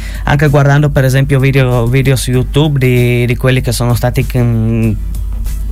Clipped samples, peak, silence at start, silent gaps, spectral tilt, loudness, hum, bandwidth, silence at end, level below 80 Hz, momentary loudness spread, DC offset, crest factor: under 0.1%; 0 dBFS; 0 s; none; -6.5 dB/octave; -11 LUFS; none; 16 kHz; 0 s; -20 dBFS; 6 LU; under 0.1%; 10 dB